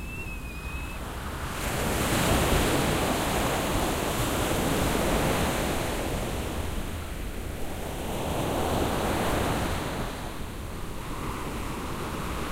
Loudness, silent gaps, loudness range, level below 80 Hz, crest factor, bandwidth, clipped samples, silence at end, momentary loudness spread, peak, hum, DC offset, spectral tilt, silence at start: -29 LUFS; none; 6 LU; -36 dBFS; 18 dB; 16 kHz; under 0.1%; 0 s; 11 LU; -10 dBFS; none; under 0.1%; -4.5 dB/octave; 0 s